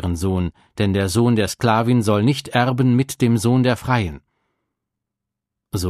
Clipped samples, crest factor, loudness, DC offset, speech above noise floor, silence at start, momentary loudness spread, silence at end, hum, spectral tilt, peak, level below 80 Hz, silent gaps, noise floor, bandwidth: under 0.1%; 18 dB; -19 LUFS; under 0.1%; 65 dB; 0 s; 7 LU; 0 s; none; -6 dB/octave; -2 dBFS; -44 dBFS; none; -83 dBFS; 15 kHz